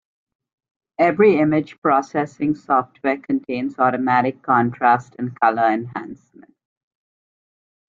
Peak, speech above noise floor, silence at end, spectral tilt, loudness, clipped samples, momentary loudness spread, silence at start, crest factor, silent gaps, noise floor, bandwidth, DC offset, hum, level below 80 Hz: -2 dBFS; over 71 dB; 1.75 s; -7.5 dB/octave; -19 LUFS; under 0.1%; 11 LU; 1 s; 18 dB; 1.78-1.82 s; under -90 dBFS; 7.6 kHz; under 0.1%; none; -64 dBFS